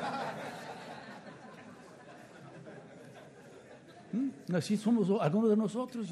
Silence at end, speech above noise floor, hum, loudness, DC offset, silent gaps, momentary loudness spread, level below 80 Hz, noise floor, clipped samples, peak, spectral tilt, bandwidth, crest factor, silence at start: 0 s; 23 dB; none; -33 LUFS; under 0.1%; none; 24 LU; -80 dBFS; -54 dBFS; under 0.1%; -18 dBFS; -7 dB/octave; 12.5 kHz; 18 dB; 0 s